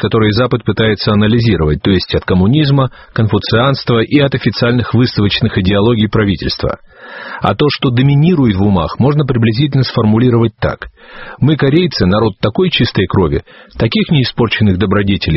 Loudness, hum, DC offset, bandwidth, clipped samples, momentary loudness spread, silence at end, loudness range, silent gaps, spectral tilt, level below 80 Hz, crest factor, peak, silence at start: -12 LUFS; none; under 0.1%; 6 kHz; under 0.1%; 7 LU; 0 s; 2 LU; none; -5.5 dB/octave; -32 dBFS; 12 dB; 0 dBFS; 0 s